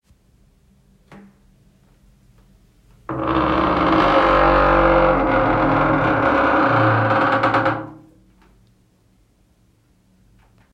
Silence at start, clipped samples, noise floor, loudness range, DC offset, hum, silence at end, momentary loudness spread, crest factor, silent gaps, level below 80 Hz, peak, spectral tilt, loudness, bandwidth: 3.1 s; under 0.1%; -58 dBFS; 11 LU; under 0.1%; none; 2.8 s; 8 LU; 16 dB; none; -36 dBFS; -4 dBFS; -7.5 dB/octave; -16 LUFS; 8.2 kHz